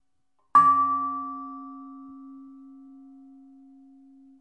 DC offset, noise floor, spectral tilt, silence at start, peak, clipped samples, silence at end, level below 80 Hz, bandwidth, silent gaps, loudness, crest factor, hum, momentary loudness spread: under 0.1%; -76 dBFS; -5.5 dB/octave; 0.55 s; -6 dBFS; under 0.1%; 1.9 s; -78 dBFS; 9.4 kHz; none; -22 LUFS; 22 dB; none; 27 LU